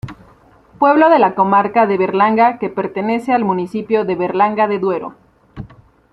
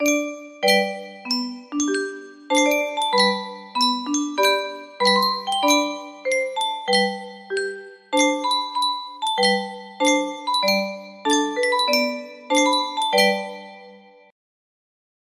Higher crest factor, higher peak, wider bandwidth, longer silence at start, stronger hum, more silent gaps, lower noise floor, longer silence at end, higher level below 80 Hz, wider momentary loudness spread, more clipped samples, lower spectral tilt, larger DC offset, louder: about the same, 14 dB vs 18 dB; about the same, -2 dBFS vs -4 dBFS; second, 10.5 kHz vs 15.5 kHz; about the same, 0.05 s vs 0 s; neither; neither; about the same, -47 dBFS vs -47 dBFS; second, 0.45 s vs 1.3 s; first, -52 dBFS vs -72 dBFS; about the same, 14 LU vs 12 LU; neither; first, -8 dB/octave vs -2 dB/octave; neither; first, -15 LUFS vs -21 LUFS